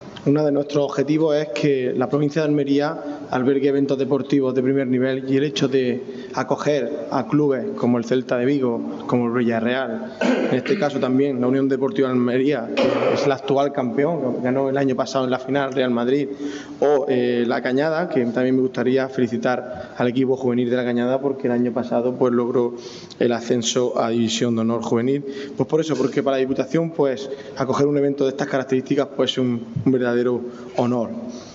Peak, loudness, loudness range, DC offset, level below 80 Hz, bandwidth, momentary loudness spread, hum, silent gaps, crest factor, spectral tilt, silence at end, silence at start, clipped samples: -6 dBFS; -21 LUFS; 1 LU; under 0.1%; -66 dBFS; 7.8 kHz; 5 LU; none; none; 14 dB; -6 dB/octave; 0 s; 0 s; under 0.1%